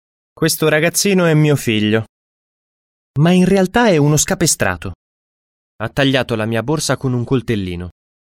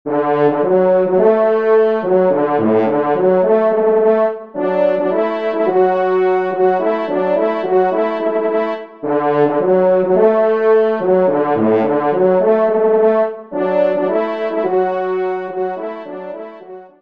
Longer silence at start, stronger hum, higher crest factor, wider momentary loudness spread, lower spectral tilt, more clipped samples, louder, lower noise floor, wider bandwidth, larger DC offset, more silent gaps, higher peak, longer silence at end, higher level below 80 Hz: first, 0.4 s vs 0.05 s; neither; about the same, 14 dB vs 14 dB; first, 13 LU vs 8 LU; second, -4.5 dB/octave vs -9.5 dB/octave; neither; about the same, -15 LUFS vs -15 LUFS; first, under -90 dBFS vs -35 dBFS; first, 16.5 kHz vs 5.2 kHz; second, under 0.1% vs 0.4%; first, 2.09-3.14 s, 4.95-5.79 s vs none; about the same, -2 dBFS vs 0 dBFS; first, 0.3 s vs 0.15 s; first, -42 dBFS vs -64 dBFS